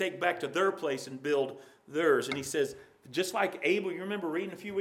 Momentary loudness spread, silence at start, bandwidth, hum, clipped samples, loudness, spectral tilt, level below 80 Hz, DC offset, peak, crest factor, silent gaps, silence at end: 9 LU; 0 s; 16.5 kHz; none; under 0.1%; -32 LUFS; -4 dB/octave; -76 dBFS; under 0.1%; -12 dBFS; 20 dB; none; 0 s